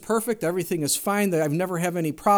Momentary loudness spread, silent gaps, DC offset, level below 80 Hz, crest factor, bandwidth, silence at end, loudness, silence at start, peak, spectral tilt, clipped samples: 3 LU; none; under 0.1%; -60 dBFS; 16 dB; over 20 kHz; 0 s; -24 LUFS; 0 s; -8 dBFS; -4.5 dB/octave; under 0.1%